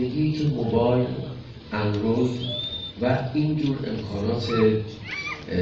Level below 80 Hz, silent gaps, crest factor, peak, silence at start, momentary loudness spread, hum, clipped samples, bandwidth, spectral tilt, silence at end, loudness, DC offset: -48 dBFS; none; 16 dB; -8 dBFS; 0 s; 9 LU; none; under 0.1%; 7.6 kHz; -7.5 dB/octave; 0 s; -25 LUFS; under 0.1%